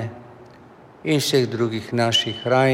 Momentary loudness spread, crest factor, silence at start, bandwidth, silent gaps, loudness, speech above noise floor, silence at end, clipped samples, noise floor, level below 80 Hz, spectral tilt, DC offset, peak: 13 LU; 16 dB; 0 s; 17 kHz; none; -21 LUFS; 27 dB; 0 s; under 0.1%; -46 dBFS; -62 dBFS; -4.5 dB/octave; under 0.1%; -6 dBFS